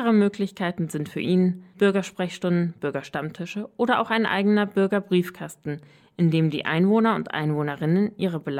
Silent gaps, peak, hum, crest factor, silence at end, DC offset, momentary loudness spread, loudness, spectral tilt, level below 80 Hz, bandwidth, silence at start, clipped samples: none; -8 dBFS; none; 14 dB; 0 s; under 0.1%; 11 LU; -24 LUFS; -7 dB/octave; -66 dBFS; 14.5 kHz; 0 s; under 0.1%